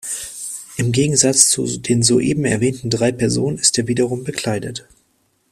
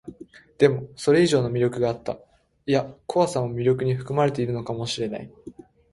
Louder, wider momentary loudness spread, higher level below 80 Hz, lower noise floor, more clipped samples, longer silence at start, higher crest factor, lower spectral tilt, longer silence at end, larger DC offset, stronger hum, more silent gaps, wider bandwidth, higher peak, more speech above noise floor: first, -17 LUFS vs -24 LUFS; about the same, 13 LU vs 14 LU; first, -50 dBFS vs -56 dBFS; first, -63 dBFS vs -47 dBFS; neither; about the same, 0.05 s vs 0.05 s; about the same, 18 dB vs 20 dB; second, -3.5 dB/octave vs -6 dB/octave; first, 0.7 s vs 0.4 s; neither; neither; neither; first, 16 kHz vs 11.5 kHz; first, 0 dBFS vs -4 dBFS; first, 46 dB vs 24 dB